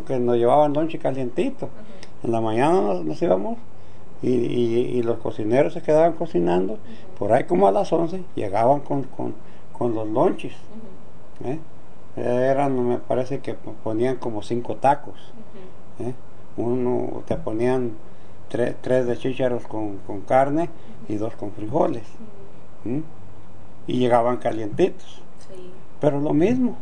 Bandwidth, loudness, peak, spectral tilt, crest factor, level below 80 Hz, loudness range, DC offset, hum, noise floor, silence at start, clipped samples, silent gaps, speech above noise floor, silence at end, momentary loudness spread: 10 kHz; -23 LUFS; -4 dBFS; -7.5 dB/octave; 20 dB; -54 dBFS; 6 LU; 6%; none; -46 dBFS; 0 s; under 0.1%; none; 24 dB; 0 s; 18 LU